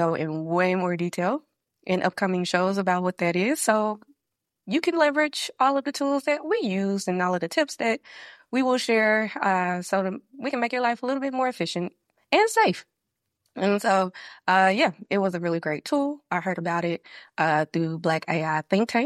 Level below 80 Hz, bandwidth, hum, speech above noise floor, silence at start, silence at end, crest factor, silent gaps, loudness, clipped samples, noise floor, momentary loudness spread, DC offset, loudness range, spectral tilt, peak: -74 dBFS; 14 kHz; none; 59 dB; 0 s; 0 s; 22 dB; none; -25 LUFS; under 0.1%; -83 dBFS; 9 LU; under 0.1%; 2 LU; -5 dB/octave; -4 dBFS